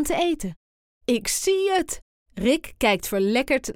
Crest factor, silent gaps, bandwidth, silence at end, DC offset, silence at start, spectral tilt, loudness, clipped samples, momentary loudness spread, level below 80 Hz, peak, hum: 16 dB; 0.56-1.01 s, 2.02-2.26 s; 17 kHz; 0.05 s; under 0.1%; 0 s; -3.5 dB/octave; -23 LUFS; under 0.1%; 12 LU; -46 dBFS; -8 dBFS; none